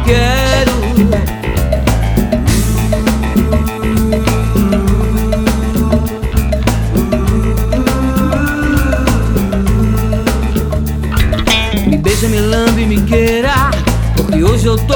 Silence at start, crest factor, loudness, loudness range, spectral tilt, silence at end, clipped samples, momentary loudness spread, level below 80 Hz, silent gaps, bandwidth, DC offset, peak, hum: 0 s; 12 dB; -13 LUFS; 2 LU; -6 dB/octave; 0 s; under 0.1%; 4 LU; -16 dBFS; none; over 20 kHz; under 0.1%; 0 dBFS; none